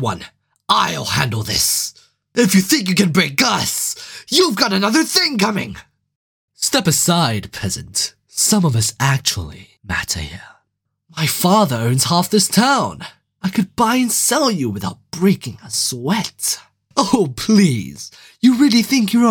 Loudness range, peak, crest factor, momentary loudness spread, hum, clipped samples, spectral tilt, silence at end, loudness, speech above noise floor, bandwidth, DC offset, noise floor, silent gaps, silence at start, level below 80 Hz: 3 LU; 0 dBFS; 18 dB; 12 LU; none; under 0.1%; -3.5 dB/octave; 0 s; -16 LUFS; 55 dB; 19 kHz; under 0.1%; -71 dBFS; 6.16-6.48 s; 0 s; -46 dBFS